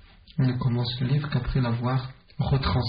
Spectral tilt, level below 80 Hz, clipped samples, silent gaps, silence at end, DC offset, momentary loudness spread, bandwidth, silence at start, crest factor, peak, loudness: -6 dB/octave; -40 dBFS; under 0.1%; none; 0 s; under 0.1%; 7 LU; 5.2 kHz; 0.3 s; 14 dB; -12 dBFS; -27 LUFS